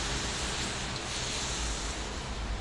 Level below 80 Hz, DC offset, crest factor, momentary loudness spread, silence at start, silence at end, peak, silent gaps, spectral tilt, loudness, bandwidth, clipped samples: -40 dBFS; under 0.1%; 14 dB; 5 LU; 0 s; 0 s; -20 dBFS; none; -2.5 dB/octave; -33 LUFS; 11.5 kHz; under 0.1%